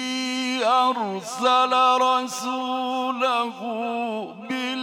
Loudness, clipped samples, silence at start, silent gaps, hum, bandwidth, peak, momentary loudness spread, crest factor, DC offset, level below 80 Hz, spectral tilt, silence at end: -23 LUFS; under 0.1%; 0 s; none; none; 17 kHz; -8 dBFS; 11 LU; 16 dB; under 0.1%; -86 dBFS; -2.5 dB/octave; 0 s